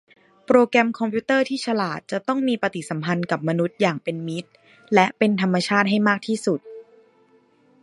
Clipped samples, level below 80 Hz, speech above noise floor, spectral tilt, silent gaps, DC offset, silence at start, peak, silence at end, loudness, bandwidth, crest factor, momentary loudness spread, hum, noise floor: under 0.1%; -68 dBFS; 37 dB; -6 dB/octave; none; under 0.1%; 0.5 s; -2 dBFS; 1 s; -22 LUFS; 11.5 kHz; 22 dB; 10 LU; none; -58 dBFS